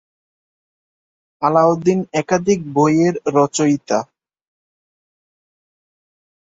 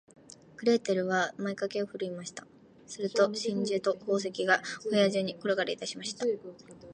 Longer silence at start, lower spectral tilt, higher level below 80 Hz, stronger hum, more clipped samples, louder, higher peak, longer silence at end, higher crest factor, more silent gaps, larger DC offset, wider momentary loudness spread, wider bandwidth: first, 1.4 s vs 0.6 s; first, -6 dB/octave vs -4 dB/octave; first, -60 dBFS vs -76 dBFS; neither; neither; first, -17 LUFS vs -30 LUFS; first, -2 dBFS vs -10 dBFS; first, 2.55 s vs 0 s; about the same, 18 dB vs 22 dB; neither; neither; second, 7 LU vs 13 LU; second, 8 kHz vs 10.5 kHz